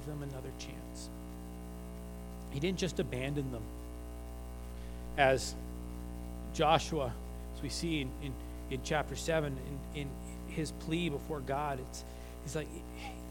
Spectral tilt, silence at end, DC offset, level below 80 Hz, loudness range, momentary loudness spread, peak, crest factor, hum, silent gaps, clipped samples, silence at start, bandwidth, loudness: -5 dB/octave; 0 s; under 0.1%; -46 dBFS; 5 LU; 16 LU; -12 dBFS; 26 dB; 60 Hz at -45 dBFS; none; under 0.1%; 0 s; 19 kHz; -38 LUFS